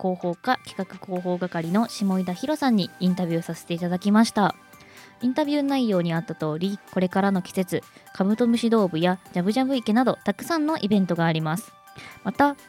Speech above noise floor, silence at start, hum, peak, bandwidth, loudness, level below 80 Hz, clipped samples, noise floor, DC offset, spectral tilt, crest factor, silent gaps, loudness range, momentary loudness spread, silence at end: 24 dB; 0 s; none; -6 dBFS; 16 kHz; -24 LUFS; -66 dBFS; under 0.1%; -48 dBFS; under 0.1%; -6.5 dB/octave; 18 dB; none; 2 LU; 10 LU; 0.15 s